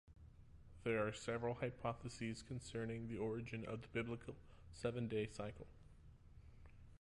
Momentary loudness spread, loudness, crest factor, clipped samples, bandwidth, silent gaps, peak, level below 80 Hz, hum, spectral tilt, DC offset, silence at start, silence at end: 22 LU; -46 LUFS; 18 dB; under 0.1%; 11 kHz; none; -30 dBFS; -64 dBFS; none; -6 dB/octave; under 0.1%; 0.05 s; 0.05 s